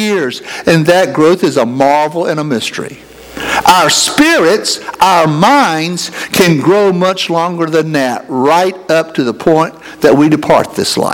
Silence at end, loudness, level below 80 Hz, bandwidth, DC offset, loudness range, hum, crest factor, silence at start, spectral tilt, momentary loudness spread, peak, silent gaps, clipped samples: 0 s; -10 LUFS; -46 dBFS; over 20 kHz; under 0.1%; 2 LU; none; 10 dB; 0 s; -4 dB/octave; 8 LU; 0 dBFS; none; 0.5%